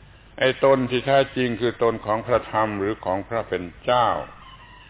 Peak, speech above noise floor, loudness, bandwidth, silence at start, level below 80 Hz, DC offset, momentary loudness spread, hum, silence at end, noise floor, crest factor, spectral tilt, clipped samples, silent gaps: -6 dBFS; 23 dB; -22 LUFS; 4 kHz; 0.35 s; -50 dBFS; under 0.1%; 8 LU; none; 0.15 s; -45 dBFS; 16 dB; -9.5 dB/octave; under 0.1%; none